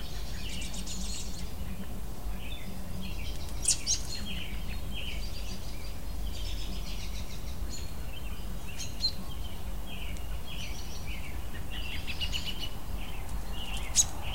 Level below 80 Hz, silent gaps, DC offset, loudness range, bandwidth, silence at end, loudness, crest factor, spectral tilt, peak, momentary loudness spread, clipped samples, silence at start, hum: -38 dBFS; none; 2%; 6 LU; 16 kHz; 0 s; -36 LUFS; 24 dB; -2.5 dB/octave; -10 dBFS; 13 LU; under 0.1%; 0 s; none